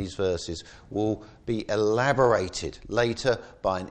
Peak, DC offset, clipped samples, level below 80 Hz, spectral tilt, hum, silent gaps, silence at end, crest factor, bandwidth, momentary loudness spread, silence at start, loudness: -8 dBFS; under 0.1%; under 0.1%; -50 dBFS; -5 dB/octave; none; none; 0 s; 18 dB; 9.6 kHz; 12 LU; 0 s; -27 LUFS